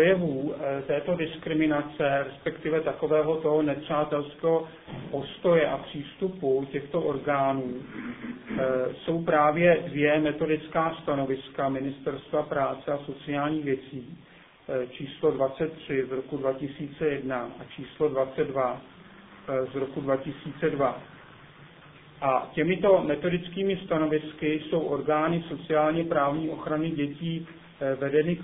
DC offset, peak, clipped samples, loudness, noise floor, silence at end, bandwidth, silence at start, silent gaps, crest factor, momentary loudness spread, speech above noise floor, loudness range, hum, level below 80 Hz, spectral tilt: under 0.1%; -8 dBFS; under 0.1%; -28 LUFS; -51 dBFS; 0 s; 4 kHz; 0 s; none; 20 dB; 11 LU; 24 dB; 5 LU; none; -58 dBFS; -10.5 dB/octave